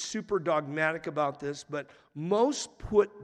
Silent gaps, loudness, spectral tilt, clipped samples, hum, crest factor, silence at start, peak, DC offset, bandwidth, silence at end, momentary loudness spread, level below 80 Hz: none; -30 LUFS; -4.5 dB/octave; under 0.1%; none; 18 dB; 0 s; -12 dBFS; under 0.1%; 10.5 kHz; 0 s; 12 LU; -56 dBFS